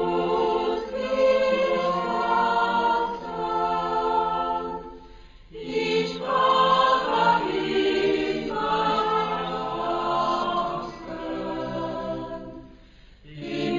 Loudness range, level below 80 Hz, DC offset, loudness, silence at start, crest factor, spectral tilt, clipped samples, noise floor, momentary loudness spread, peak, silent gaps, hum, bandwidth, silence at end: 6 LU; -52 dBFS; under 0.1%; -24 LUFS; 0 s; 16 dB; -5.5 dB/octave; under 0.1%; -50 dBFS; 13 LU; -8 dBFS; none; none; 7.4 kHz; 0 s